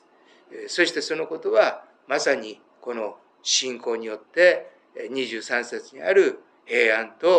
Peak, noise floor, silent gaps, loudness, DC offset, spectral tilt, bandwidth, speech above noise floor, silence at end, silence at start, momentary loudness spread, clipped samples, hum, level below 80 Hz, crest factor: -4 dBFS; -56 dBFS; none; -23 LUFS; under 0.1%; -1.5 dB/octave; 10 kHz; 33 dB; 0 s; 0.5 s; 19 LU; under 0.1%; none; under -90 dBFS; 20 dB